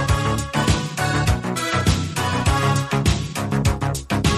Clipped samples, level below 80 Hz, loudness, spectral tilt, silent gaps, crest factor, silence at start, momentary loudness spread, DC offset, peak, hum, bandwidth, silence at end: under 0.1%; -30 dBFS; -21 LUFS; -5 dB/octave; none; 14 dB; 0 s; 3 LU; under 0.1%; -4 dBFS; none; 13.5 kHz; 0 s